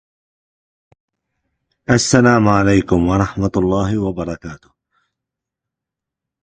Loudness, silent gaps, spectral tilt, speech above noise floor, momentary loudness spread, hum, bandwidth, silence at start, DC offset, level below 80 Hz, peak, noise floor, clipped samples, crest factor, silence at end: -15 LUFS; none; -5.5 dB/octave; 69 dB; 15 LU; none; 9.4 kHz; 1.9 s; under 0.1%; -38 dBFS; 0 dBFS; -84 dBFS; under 0.1%; 18 dB; 1.85 s